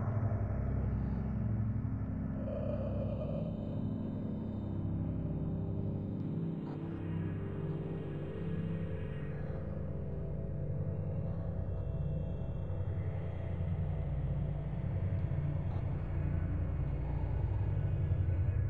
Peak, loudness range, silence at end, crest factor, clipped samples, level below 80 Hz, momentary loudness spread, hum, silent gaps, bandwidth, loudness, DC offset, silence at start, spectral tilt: -22 dBFS; 3 LU; 0 s; 14 dB; under 0.1%; -44 dBFS; 5 LU; none; none; 3.9 kHz; -38 LUFS; 0.3%; 0 s; -11.5 dB/octave